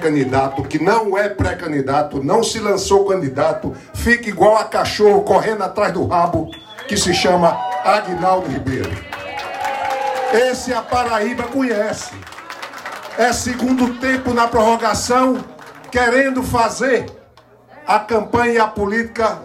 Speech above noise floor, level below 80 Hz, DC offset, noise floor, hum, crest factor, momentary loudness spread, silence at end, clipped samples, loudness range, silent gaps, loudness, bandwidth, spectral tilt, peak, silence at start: 31 dB; -40 dBFS; under 0.1%; -47 dBFS; none; 16 dB; 12 LU; 0 s; under 0.1%; 4 LU; none; -17 LUFS; 16 kHz; -4.5 dB/octave; 0 dBFS; 0 s